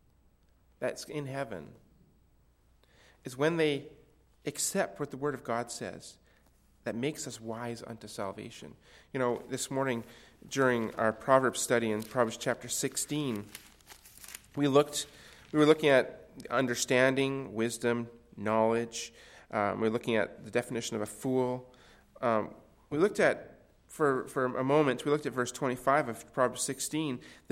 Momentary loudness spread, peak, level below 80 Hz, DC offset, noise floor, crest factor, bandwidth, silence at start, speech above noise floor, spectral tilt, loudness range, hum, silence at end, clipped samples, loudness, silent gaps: 16 LU; -8 dBFS; -66 dBFS; under 0.1%; -66 dBFS; 24 dB; 16.5 kHz; 0.8 s; 35 dB; -4.5 dB/octave; 9 LU; none; 0.2 s; under 0.1%; -31 LUFS; none